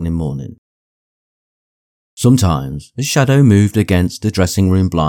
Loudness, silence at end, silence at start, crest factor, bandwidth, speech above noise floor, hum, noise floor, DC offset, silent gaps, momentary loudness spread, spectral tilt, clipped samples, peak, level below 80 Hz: -14 LUFS; 0 s; 0 s; 14 dB; 18 kHz; over 77 dB; none; under -90 dBFS; under 0.1%; 0.58-2.17 s; 13 LU; -6 dB/octave; under 0.1%; 0 dBFS; -36 dBFS